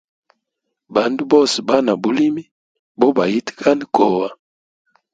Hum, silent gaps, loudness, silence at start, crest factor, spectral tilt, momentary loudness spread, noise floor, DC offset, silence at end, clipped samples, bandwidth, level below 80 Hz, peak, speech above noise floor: none; 2.51-2.95 s; -17 LUFS; 0.9 s; 18 dB; -5 dB/octave; 7 LU; -77 dBFS; under 0.1%; 0.8 s; under 0.1%; 9.4 kHz; -62 dBFS; 0 dBFS; 61 dB